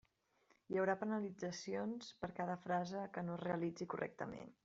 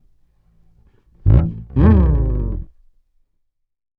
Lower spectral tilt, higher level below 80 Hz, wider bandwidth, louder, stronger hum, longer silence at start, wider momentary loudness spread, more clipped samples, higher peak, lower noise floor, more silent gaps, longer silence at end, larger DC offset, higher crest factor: second, -5.5 dB/octave vs -12.5 dB/octave; second, -78 dBFS vs -22 dBFS; first, 7.8 kHz vs 3.6 kHz; second, -43 LUFS vs -17 LUFS; neither; second, 0.7 s vs 1.25 s; second, 8 LU vs 12 LU; neither; second, -24 dBFS vs 0 dBFS; first, -77 dBFS vs -68 dBFS; neither; second, 0.1 s vs 1.35 s; neither; about the same, 20 dB vs 18 dB